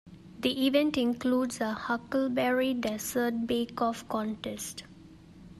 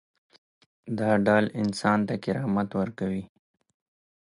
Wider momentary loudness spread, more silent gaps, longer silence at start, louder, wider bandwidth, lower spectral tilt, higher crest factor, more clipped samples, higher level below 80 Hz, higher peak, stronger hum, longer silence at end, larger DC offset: about the same, 10 LU vs 10 LU; neither; second, 0.05 s vs 0.85 s; second, -30 LUFS vs -26 LUFS; first, 14.5 kHz vs 11 kHz; second, -4 dB/octave vs -7 dB/octave; about the same, 18 dB vs 20 dB; neither; about the same, -62 dBFS vs -60 dBFS; second, -12 dBFS vs -8 dBFS; neither; second, 0 s vs 0.95 s; neither